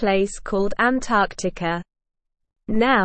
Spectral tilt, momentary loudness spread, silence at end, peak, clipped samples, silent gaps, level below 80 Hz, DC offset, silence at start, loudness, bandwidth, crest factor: -5 dB/octave; 8 LU; 0 s; -6 dBFS; under 0.1%; none; -42 dBFS; under 0.1%; 0 s; -22 LUFS; 8.8 kHz; 16 dB